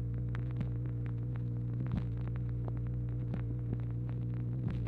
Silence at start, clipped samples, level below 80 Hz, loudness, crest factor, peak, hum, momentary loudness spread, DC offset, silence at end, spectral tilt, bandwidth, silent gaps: 0 s; under 0.1%; -46 dBFS; -37 LUFS; 14 dB; -22 dBFS; 60 Hz at -40 dBFS; 1 LU; under 0.1%; 0 s; -11 dB/octave; 3.9 kHz; none